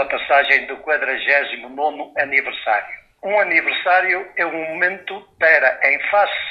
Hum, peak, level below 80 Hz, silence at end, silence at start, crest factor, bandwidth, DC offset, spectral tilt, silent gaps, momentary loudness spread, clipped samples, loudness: none; 0 dBFS; -60 dBFS; 0 s; 0 s; 18 dB; 6.8 kHz; under 0.1%; -4 dB/octave; none; 9 LU; under 0.1%; -17 LUFS